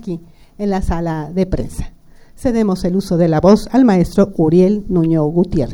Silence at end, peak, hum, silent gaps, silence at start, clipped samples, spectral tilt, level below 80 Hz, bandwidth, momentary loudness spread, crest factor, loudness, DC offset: 0 s; 0 dBFS; none; none; 0 s; under 0.1%; -8 dB/octave; -30 dBFS; 16.5 kHz; 12 LU; 14 dB; -15 LUFS; under 0.1%